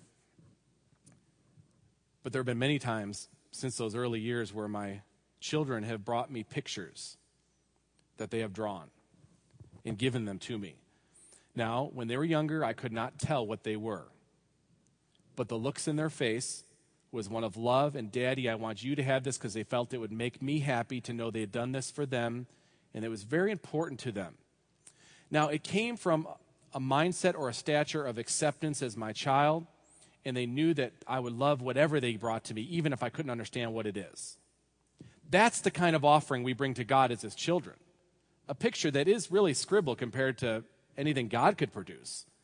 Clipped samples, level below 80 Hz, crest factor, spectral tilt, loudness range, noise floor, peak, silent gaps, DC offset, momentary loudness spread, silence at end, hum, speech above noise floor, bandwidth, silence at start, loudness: under 0.1%; -74 dBFS; 24 dB; -5 dB/octave; 8 LU; -74 dBFS; -10 dBFS; none; under 0.1%; 14 LU; 0.2 s; none; 41 dB; 10.5 kHz; 2.25 s; -33 LUFS